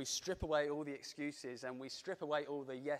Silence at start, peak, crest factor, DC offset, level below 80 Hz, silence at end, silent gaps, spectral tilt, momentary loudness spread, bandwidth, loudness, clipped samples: 0 s; -22 dBFS; 20 dB; under 0.1%; -62 dBFS; 0 s; none; -3.5 dB/octave; 9 LU; 15 kHz; -42 LUFS; under 0.1%